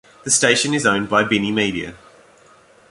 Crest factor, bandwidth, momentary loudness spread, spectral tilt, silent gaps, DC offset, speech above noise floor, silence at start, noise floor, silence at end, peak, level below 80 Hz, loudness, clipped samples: 18 dB; 11.5 kHz; 9 LU; -2.5 dB/octave; none; under 0.1%; 32 dB; 0.25 s; -50 dBFS; 0.95 s; -2 dBFS; -54 dBFS; -17 LUFS; under 0.1%